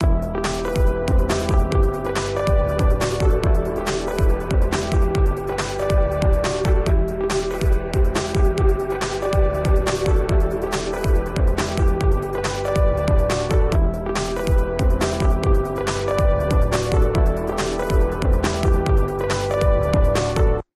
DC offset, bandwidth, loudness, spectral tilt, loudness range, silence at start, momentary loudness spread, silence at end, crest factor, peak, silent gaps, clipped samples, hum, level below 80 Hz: under 0.1%; 13.5 kHz; -21 LUFS; -6 dB/octave; 1 LU; 0 s; 4 LU; 0.15 s; 12 dB; -6 dBFS; none; under 0.1%; none; -20 dBFS